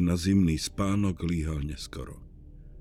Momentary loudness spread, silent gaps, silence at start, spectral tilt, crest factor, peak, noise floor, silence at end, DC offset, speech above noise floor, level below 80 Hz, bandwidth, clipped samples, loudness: 17 LU; none; 0 s; -6 dB/octave; 16 dB; -12 dBFS; -47 dBFS; 0 s; under 0.1%; 20 dB; -40 dBFS; 15 kHz; under 0.1%; -28 LUFS